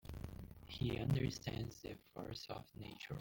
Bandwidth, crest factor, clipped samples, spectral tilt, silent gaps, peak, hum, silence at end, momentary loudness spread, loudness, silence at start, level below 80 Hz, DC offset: 17 kHz; 18 dB; under 0.1%; -6 dB/octave; none; -26 dBFS; none; 0 s; 14 LU; -45 LUFS; 0.05 s; -58 dBFS; under 0.1%